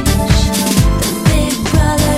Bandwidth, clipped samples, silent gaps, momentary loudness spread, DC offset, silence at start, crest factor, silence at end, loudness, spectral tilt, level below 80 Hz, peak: 16.5 kHz; under 0.1%; none; 2 LU; under 0.1%; 0 s; 12 dB; 0 s; -13 LUFS; -5 dB/octave; -18 dBFS; 0 dBFS